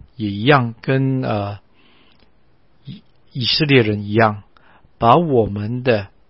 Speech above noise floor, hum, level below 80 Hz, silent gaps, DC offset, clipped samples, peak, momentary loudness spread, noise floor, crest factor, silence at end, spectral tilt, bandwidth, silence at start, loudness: 42 dB; none; -48 dBFS; none; 0.3%; under 0.1%; 0 dBFS; 20 LU; -58 dBFS; 18 dB; 0.2 s; -9.5 dB/octave; 5.8 kHz; 0.2 s; -17 LUFS